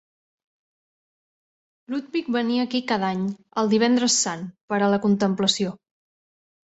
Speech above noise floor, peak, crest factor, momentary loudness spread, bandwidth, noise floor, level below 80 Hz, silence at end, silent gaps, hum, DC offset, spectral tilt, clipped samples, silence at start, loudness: over 67 dB; -6 dBFS; 18 dB; 9 LU; 8.2 kHz; under -90 dBFS; -68 dBFS; 1 s; 4.61-4.68 s; none; under 0.1%; -4 dB/octave; under 0.1%; 1.9 s; -23 LUFS